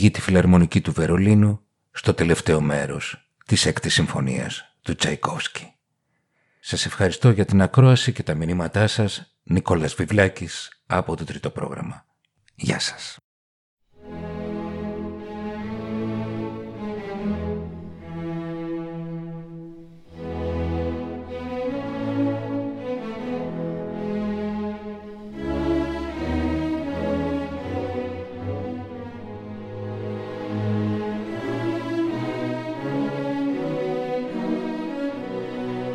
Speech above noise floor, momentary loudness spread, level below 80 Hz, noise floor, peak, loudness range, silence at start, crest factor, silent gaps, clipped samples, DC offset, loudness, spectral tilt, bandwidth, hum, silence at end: 52 dB; 15 LU; -44 dBFS; -73 dBFS; -2 dBFS; 11 LU; 0 s; 22 dB; 13.24-13.77 s; under 0.1%; under 0.1%; -24 LUFS; -6 dB/octave; 12 kHz; none; 0 s